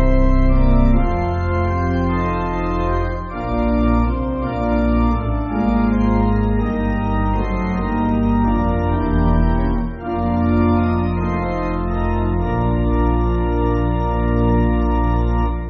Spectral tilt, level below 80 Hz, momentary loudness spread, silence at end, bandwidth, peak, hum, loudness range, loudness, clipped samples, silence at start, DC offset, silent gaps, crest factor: -8 dB/octave; -20 dBFS; 5 LU; 0 s; 6.2 kHz; -2 dBFS; none; 1 LU; -19 LUFS; under 0.1%; 0 s; under 0.1%; none; 14 dB